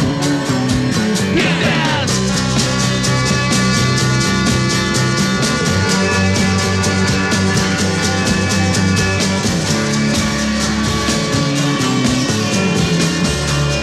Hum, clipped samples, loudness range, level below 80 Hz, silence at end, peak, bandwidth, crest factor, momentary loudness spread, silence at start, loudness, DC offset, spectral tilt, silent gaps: none; under 0.1%; 1 LU; -34 dBFS; 0 s; -2 dBFS; 14 kHz; 12 dB; 2 LU; 0 s; -15 LUFS; 0.2%; -4 dB/octave; none